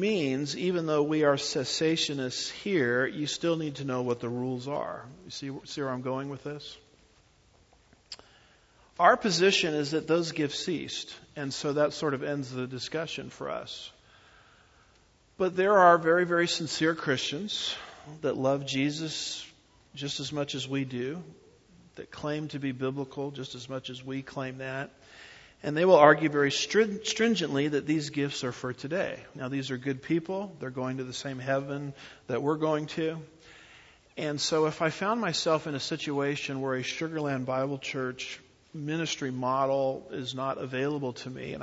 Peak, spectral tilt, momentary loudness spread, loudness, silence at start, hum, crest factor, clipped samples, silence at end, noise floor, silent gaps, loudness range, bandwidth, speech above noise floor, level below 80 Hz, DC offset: -4 dBFS; -4.5 dB/octave; 15 LU; -29 LUFS; 0 s; none; 26 dB; under 0.1%; 0 s; -63 dBFS; none; 10 LU; 8 kHz; 34 dB; -68 dBFS; under 0.1%